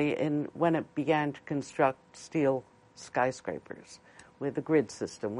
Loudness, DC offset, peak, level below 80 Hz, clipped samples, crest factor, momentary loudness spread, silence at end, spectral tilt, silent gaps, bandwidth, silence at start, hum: -31 LUFS; under 0.1%; -12 dBFS; -70 dBFS; under 0.1%; 18 dB; 17 LU; 0 s; -6 dB/octave; none; 11 kHz; 0 s; none